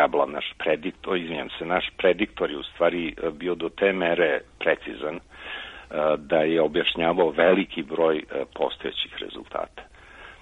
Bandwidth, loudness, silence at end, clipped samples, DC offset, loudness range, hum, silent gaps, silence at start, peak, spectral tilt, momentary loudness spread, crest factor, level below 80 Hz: 8.2 kHz; -25 LUFS; 0.05 s; under 0.1%; under 0.1%; 3 LU; none; none; 0 s; -4 dBFS; -6.5 dB/octave; 12 LU; 20 dB; -54 dBFS